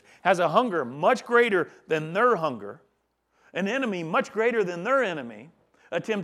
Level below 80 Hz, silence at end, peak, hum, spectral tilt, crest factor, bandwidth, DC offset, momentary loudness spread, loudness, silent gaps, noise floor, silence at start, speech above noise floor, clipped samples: -78 dBFS; 0 s; -6 dBFS; none; -5.5 dB/octave; 20 dB; 12.5 kHz; under 0.1%; 12 LU; -25 LUFS; none; -72 dBFS; 0.25 s; 47 dB; under 0.1%